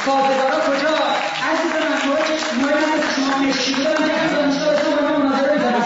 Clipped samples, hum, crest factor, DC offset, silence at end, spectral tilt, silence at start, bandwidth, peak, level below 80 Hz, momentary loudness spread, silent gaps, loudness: under 0.1%; none; 12 dB; under 0.1%; 0 s; -3.5 dB/octave; 0 s; 8 kHz; -6 dBFS; -58 dBFS; 2 LU; none; -18 LUFS